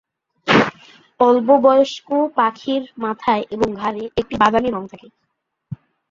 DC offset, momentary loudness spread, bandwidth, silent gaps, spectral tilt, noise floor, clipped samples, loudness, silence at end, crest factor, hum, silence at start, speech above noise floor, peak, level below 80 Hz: under 0.1%; 17 LU; 7.6 kHz; none; -5.5 dB/octave; -54 dBFS; under 0.1%; -17 LUFS; 0.35 s; 18 dB; none; 0.45 s; 37 dB; -2 dBFS; -50 dBFS